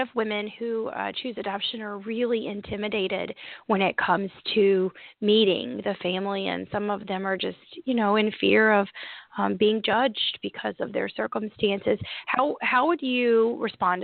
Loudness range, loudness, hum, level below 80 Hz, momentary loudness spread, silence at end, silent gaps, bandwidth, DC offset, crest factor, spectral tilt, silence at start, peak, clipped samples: 4 LU; -25 LUFS; none; -64 dBFS; 10 LU; 0 s; none; 4.7 kHz; under 0.1%; 20 dB; -9.5 dB/octave; 0 s; -6 dBFS; under 0.1%